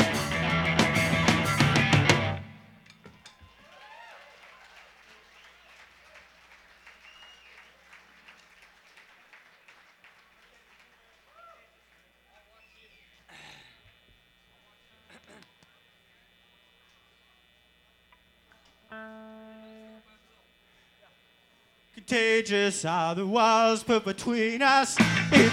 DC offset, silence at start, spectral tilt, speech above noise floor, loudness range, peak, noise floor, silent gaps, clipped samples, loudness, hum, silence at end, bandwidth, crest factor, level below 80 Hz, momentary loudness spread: under 0.1%; 0 s; -4.5 dB/octave; 40 dB; 28 LU; -4 dBFS; -64 dBFS; none; under 0.1%; -24 LUFS; none; 0 s; 17.5 kHz; 26 dB; -56 dBFS; 28 LU